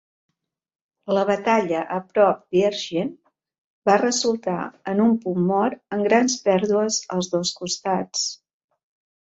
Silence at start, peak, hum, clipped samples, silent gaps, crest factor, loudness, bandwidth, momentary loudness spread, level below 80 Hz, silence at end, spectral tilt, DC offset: 1.05 s; -2 dBFS; none; under 0.1%; 3.58-3.82 s; 20 dB; -22 LUFS; 8.2 kHz; 8 LU; -66 dBFS; 0.85 s; -4 dB/octave; under 0.1%